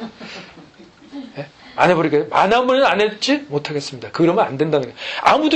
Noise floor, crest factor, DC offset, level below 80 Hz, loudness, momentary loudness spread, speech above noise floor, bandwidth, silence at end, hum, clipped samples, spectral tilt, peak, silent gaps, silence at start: -45 dBFS; 18 dB; under 0.1%; -56 dBFS; -17 LUFS; 19 LU; 28 dB; 9 kHz; 0 s; none; under 0.1%; -5 dB/octave; 0 dBFS; none; 0 s